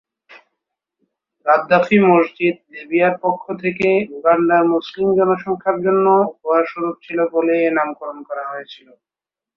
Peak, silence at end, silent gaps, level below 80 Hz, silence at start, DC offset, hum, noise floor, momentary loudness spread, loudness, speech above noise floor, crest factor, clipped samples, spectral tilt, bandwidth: -2 dBFS; 0.8 s; none; -62 dBFS; 0.3 s; under 0.1%; none; -79 dBFS; 12 LU; -17 LUFS; 62 dB; 16 dB; under 0.1%; -8 dB/octave; 6.2 kHz